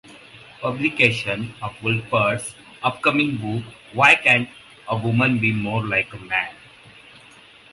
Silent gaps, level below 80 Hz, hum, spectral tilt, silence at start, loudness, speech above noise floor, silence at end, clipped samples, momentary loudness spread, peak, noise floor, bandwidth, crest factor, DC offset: none; -56 dBFS; none; -5 dB/octave; 0.1 s; -20 LUFS; 27 dB; 1.2 s; under 0.1%; 15 LU; 0 dBFS; -48 dBFS; 11.5 kHz; 22 dB; under 0.1%